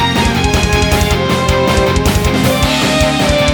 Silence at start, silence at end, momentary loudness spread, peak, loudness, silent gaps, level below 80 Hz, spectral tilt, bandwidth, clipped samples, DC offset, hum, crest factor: 0 s; 0 s; 1 LU; 0 dBFS; -12 LUFS; none; -20 dBFS; -4.5 dB/octave; over 20 kHz; under 0.1%; under 0.1%; none; 12 dB